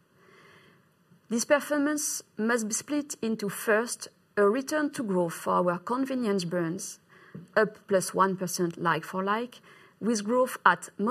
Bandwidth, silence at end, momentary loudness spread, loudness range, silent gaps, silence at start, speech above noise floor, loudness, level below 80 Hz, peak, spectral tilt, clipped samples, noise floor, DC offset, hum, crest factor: 14 kHz; 0 s; 9 LU; 2 LU; none; 1.3 s; 35 dB; -28 LUFS; -78 dBFS; -4 dBFS; -4 dB/octave; under 0.1%; -62 dBFS; under 0.1%; none; 24 dB